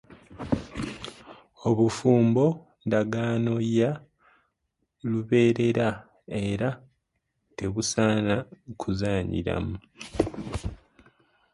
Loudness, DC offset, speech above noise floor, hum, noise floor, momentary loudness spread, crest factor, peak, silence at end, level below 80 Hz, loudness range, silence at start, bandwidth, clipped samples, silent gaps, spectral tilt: -26 LUFS; under 0.1%; 53 dB; none; -78 dBFS; 17 LU; 20 dB; -8 dBFS; 0.8 s; -48 dBFS; 4 LU; 0.3 s; 11.5 kHz; under 0.1%; none; -6.5 dB/octave